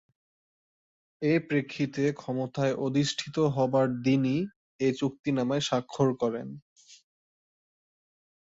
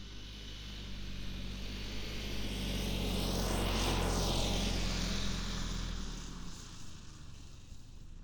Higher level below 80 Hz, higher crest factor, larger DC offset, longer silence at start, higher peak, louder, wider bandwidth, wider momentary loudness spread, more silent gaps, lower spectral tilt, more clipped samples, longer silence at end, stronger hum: second, -68 dBFS vs -42 dBFS; about the same, 18 dB vs 16 dB; neither; first, 1.2 s vs 0 s; first, -12 dBFS vs -22 dBFS; first, -28 LUFS vs -38 LUFS; second, 8 kHz vs over 20 kHz; second, 7 LU vs 19 LU; first, 4.56-4.79 s, 5.19-5.24 s, 6.62-6.76 s vs none; first, -6 dB/octave vs -4 dB/octave; neither; first, 1.5 s vs 0 s; neither